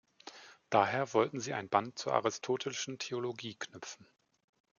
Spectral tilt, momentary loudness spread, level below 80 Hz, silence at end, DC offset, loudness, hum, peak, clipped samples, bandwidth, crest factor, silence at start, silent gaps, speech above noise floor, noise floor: -4 dB/octave; 21 LU; -82 dBFS; 0.85 s; under 0.1%; -34 LUFS; none; -12 dBFS; under 0.1%; 7.4 kHz; 24 dB; 0.25 s; none; 20 dB; -54 dBFS